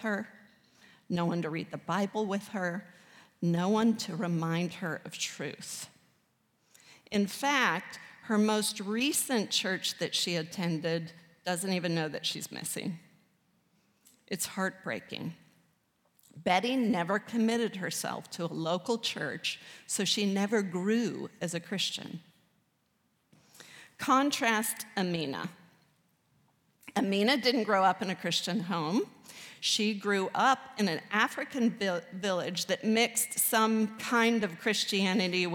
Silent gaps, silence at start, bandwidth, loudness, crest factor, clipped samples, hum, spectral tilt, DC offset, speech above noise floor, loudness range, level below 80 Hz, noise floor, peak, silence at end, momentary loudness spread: none; 0 s; 18.5 kHz; -31 LUFS; 20 dB; under 0.1%; none; -3.5 dB/octave; under 0.1%; 44 dB; 7 LU; -80 dBFS; -74 dBFS; -12 dBFS; 0 s; 12 LU